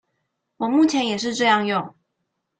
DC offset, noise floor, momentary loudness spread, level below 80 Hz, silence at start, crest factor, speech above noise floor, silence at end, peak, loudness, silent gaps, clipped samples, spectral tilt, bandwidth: under 0.1%; -77 dBFS; 9 LU; -68 dBFS; 0.6 s; 20 dB; 57 dB; 0.7 s; -4 dBFS; -20 LUFS; none; under 0.1%; -4 dB/octave; 9.2 kHz